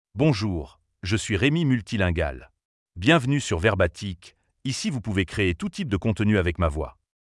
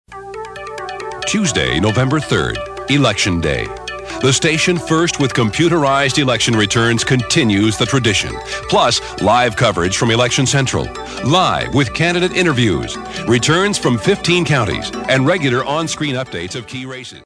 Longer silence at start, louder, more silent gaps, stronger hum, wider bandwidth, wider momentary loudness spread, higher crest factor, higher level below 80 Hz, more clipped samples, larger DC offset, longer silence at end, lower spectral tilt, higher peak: about the same, 0.15 s vs 0.1 s; second, -24 LUFS vs -15 LUFS; first, 2.65-2.86 s vs none; neither; about the same, 12 kHz vs 11 kHz; first, 14 LU vs 11 LU; about the same, 20 dB vs 16 dB; about the same, -42 dBFS vs -38 dBFS; neither; neither; first, 0.45 s vs 0.1 s; first, -5.5 dB/octave vs -4 dB/octave; second, -4 dBFS vs 0 dBFS